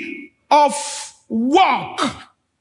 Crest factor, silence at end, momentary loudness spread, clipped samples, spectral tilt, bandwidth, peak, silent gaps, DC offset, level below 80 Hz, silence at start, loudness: 16 dB; 0.35 s; 16 LU; under 0.1%; -3 dB/octave; 11 kHz; -2 dBFS; none; under 0.1%; -62 dBFS; 0 s; -18 LUFS